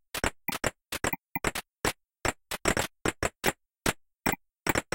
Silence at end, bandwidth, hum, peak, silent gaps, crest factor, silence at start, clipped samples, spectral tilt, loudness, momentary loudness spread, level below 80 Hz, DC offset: 0.15 s; 17 kHz; none; -8 dBFS; none; 24 dB; 0.15 s; under 0.1%; -3 dB/octave; -31 LUFS; 4 LU; -46 dBFS; under 0.1%